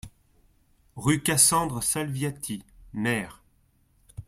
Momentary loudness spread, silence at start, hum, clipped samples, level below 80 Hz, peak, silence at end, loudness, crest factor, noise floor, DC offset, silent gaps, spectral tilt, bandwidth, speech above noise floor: 18 LU; 0.05 s; none; under 0.1%; -54 dBFS; -4 dBFS; 0.05 s; -24 LUFS; 24 dB; -65 dBFS; under 0.1%; none; -3 dB/octave; 16 kHz; 39 dB